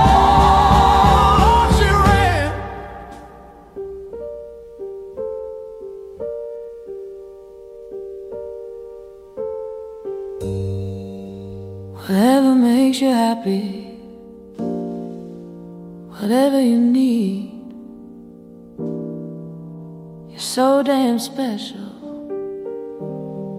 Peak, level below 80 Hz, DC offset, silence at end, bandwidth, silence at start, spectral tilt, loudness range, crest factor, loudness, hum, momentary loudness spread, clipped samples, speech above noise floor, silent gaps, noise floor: -2 dBFS; -30 dBFS; under 0.1%; 0 s; 15.5 kHz; 0 s; -6 dB/octave; 16 LU; 18 dB; -17 LUFS; none; 24 LU; under 0.1%; 25 dB; none; -41 dBFS